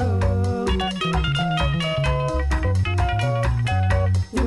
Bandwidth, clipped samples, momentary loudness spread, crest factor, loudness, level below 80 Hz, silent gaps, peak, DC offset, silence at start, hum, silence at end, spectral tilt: 11.5 kHz; under 0.1%; 2 LU; 12 dB; -22 LUFS; -28 dBFS; none; -8 dBFS; under 0.1%; 0 s; none; 0 s; -6.5 dB/octave